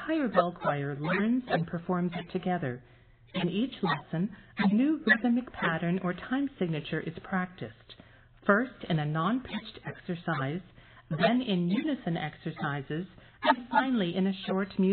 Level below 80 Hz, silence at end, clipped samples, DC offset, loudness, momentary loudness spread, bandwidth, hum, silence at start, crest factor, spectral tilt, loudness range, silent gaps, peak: -62 dBFS; 0 s; under 0.1%; under 0.1%; -30 LUFS; 11 LU; 4.6 kHz; none; 0 s; 22 dB; -5 dB/octave; 3 LU; none; -8 dBFS